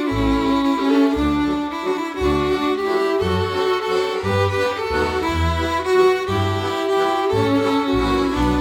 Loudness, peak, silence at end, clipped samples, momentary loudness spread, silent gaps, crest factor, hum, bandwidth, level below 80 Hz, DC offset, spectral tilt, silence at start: -19 LUFS; -6 dBFS; 0 s; under 0.1%; 4 LU; none; 12 dB; none; 17 kHz; -34 dBFS; under 0.1%; -6 dB/octave; 0 s